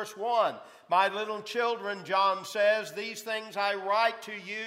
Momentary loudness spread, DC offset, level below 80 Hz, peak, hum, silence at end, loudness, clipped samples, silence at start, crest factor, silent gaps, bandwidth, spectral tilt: 9 LU; under 0.1%; under -90 dBFS; -10 dBFS; none; 0 s; -29 LUFS; under 0.1%; 0 s; 18 dB; none; 16 kHz; -2.5 dB/octave